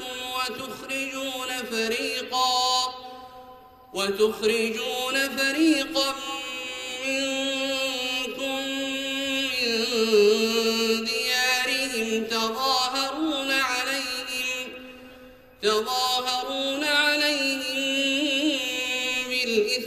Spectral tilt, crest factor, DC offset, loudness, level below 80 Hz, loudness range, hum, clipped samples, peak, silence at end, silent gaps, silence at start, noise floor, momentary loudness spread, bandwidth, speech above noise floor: -1.5 dB/octave; 16 dB; under 0.1%; -24 LUFS; -62 dBFS; 4 LU; none; under 0.1%; -8 dBFS; 0 s; none; 0 s; -48 dBFS; 9 LU; 15 kHz; 23 dB